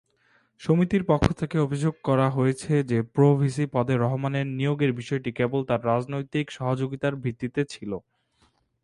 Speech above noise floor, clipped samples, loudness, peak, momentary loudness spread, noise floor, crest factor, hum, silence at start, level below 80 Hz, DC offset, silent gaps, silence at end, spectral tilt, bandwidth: 42 dB; under 0.1%; -25 LUFS; -4 dBFS; 8 LU; -66 dBFS; 22 dB; none; 0.6 s; -50 dBFS; under 0.1%; none; 0.85 s; -7.5 dB/octave; 11 kHz